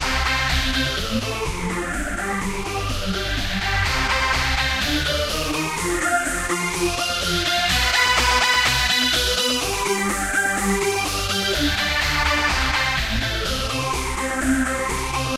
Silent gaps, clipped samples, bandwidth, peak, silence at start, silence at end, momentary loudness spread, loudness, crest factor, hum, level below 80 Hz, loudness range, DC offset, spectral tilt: none; under 0.1%; 16 kHz; -4 dBFS; 0 s; 0 s; 8 LU; -20 LUFS; 16 dB; none; -30 dBFS; 5 LU; under 0.1%; -2.5 dB/octave